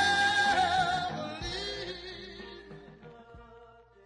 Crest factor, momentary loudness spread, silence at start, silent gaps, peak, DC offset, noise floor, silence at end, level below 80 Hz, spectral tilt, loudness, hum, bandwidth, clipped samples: 16 dB; 25 LU; 0 s; none; -16 dBFS; under 0.1%; -56 dBFS; 0.4 s; -56 dBFS; -2.5 dB/octave; -29 LUFS; none; 11 kHz; under 0.1%